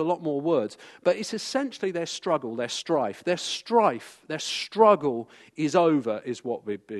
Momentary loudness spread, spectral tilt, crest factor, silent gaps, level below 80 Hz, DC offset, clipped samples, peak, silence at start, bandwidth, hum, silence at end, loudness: 11 LU; -4.5 dB/octave; 20 dB; none; -78 dBFS; under 0.1%; under 0.1%; -6 dBFS; 0 s; 12.5 kHz; none; 0 s; -26 LUFS